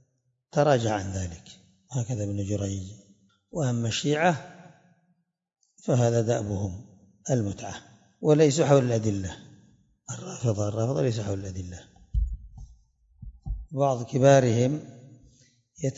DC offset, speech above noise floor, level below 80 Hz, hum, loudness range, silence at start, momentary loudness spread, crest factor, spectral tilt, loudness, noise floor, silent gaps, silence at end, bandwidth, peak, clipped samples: under 0.1%; 47 dB; -44 dBFS; none; 6 LU; 0.55 s; 20 LU; 20 dB; -6 dB/octave; -26 LUFS; -72 dBFS; none; 0.05 s; 7.8 kHz; -6 dBFS; under 0.1%